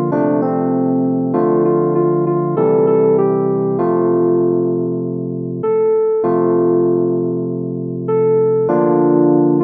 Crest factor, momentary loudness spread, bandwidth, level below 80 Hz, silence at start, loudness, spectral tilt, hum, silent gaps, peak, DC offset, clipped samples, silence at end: 14 dB; 8 LU; 2.8 kHz; -64 dBFS; 0 s; -15 LUFS; -13.5 dB/octave; none; none; -2 dBFS; under 0.1%; under 0.1%; 0 s